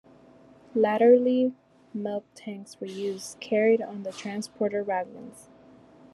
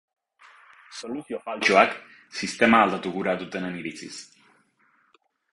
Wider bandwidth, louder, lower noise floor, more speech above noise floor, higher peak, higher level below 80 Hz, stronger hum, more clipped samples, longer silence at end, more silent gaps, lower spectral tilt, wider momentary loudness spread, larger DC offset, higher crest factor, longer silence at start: about the same, 12.5 kHz vs 11.5 kHz; second, -26 LUFS vs -23 LUFS; second, -54 dBFS vs -66 dBFS; second, 28 dB vs 41 dB; second, -8 dBFS vs -4 dBFS; second, -76 dBFS vs -64 dBFS; neither; neither; second, 0.7 s vs 1.3 s; neither; first, -5.5 dB/octave vs -4 dB/octave; about the same, 20 LU vs 21 LU; neither; about the same, 20 dB vs 22 dB; second, 0.75 s vs 0.9 s